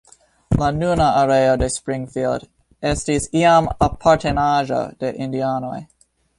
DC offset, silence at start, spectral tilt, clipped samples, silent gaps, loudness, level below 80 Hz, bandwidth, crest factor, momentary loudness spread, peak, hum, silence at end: under 0.1%; 0.5 s; -5.5 dB/octave; under 0.1%; none; -19 LUFS; -36 dBFS; 11.5 kHz; 16 dB; 11 LU; -2 dBFS; none; 0.55 s